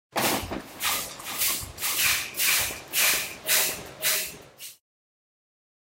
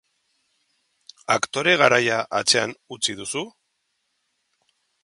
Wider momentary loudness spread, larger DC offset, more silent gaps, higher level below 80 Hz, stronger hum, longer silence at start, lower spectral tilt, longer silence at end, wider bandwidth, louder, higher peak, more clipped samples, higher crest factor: about the same, 13 LU vs 14 LU; neither; neither; first, -54 dBFS vs -68 dBFS; neither; second, 0.15 s vs 1.3 s; second, 0 dB/octave vs -2 dB/octave; second, 1.15 s vs 1.55 s; first, 16 kHz vs 11.5 kHz; second, -24 LUFS vs -21 LUFS; second, -10 dBFS vs 0 dBFS; neither; second, 18 dB vs 24 dB